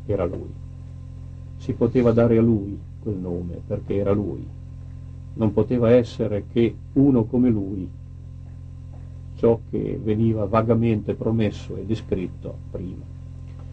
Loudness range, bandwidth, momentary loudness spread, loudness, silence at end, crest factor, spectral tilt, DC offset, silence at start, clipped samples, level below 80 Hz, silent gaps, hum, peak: 4 LU; 7.8 kHz; 20 LU; -22 LUFS; 0 s; 18 dB; -9.5 dB/octave; under 0.1%; 0 s; under 0.1%; -42 dBFS; none; none; -6 dBFS